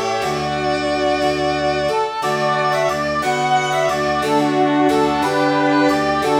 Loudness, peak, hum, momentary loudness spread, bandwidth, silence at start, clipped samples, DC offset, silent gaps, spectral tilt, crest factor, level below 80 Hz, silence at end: -17 LUFS; -4 dBFS; none; 4 LU; 17 kHz; 0 s; under 0.1%; under 0.1%; none; -4.5 dB/octave; 14 dB; -46 dBFS; 0 s